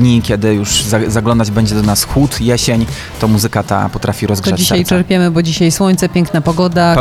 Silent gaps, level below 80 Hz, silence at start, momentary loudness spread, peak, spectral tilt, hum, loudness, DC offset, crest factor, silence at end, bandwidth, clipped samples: none; -30 dBFS; 0 s; 4 LU; 0 dBFS; -5 dB/octave; none; -12 LUFS; under 0.1%; 12 dB; 0 s; 16 kHz; under 0.1%